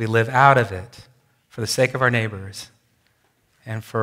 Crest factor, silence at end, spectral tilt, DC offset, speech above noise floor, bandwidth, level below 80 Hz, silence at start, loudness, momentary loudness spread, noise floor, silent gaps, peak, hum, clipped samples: 22 dB; 0 s; -5 dB/octave; under 0.1%; 44 dB; 16 kHz; -62 dBFS; 0 s; -19 LUFS; 20 LU; -64 dBFS; none; 0 dBFS; none; under 0.1%